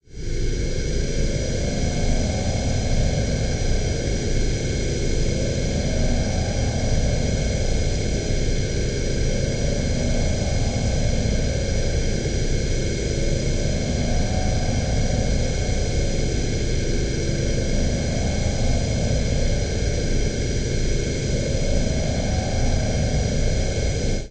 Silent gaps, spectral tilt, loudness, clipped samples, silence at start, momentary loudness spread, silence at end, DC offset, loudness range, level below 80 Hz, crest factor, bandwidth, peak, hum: none; -5 dB/octave; -24 LUFS; under 0.1%; 0 s; 2 LU; 0 s; 1%; 0 LU; -24 dBFS; 12 dB; 9.2 kHz; -8 dBFS; none